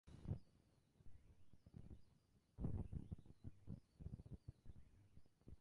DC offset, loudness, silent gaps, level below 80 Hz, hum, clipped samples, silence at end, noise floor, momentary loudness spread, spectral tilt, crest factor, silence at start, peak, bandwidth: under 0.1%; -56 LUFS; none; -62 dBFS; none; under 0.1%; 0 s; -77 dBFS; 17 LU; -9.5 dB/octave; 20 dB; 0.05 s; -36 dBFS; 11 kHz